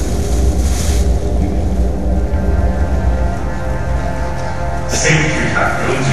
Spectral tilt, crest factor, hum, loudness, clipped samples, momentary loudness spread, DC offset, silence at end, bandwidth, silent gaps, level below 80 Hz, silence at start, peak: -5 dB/octave; 14 dB; none; -17 LUFS; under 0.1%; 8 LU; 8%; 0 s; 13.5 kHz; none; -18 dBFS; 0 s; 0 dBFS